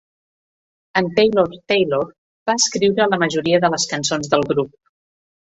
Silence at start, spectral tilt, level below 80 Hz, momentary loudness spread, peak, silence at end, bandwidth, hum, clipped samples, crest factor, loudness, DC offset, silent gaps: 0.95 s; -3.5 dB/octave; -56 dBFS; 7 LU; -2 dBFS; 0.9 s; 8.4 kHz; none; under 0.1%; 18 dB; -18 LUFS; under 0.1%; 2.18-2.46 s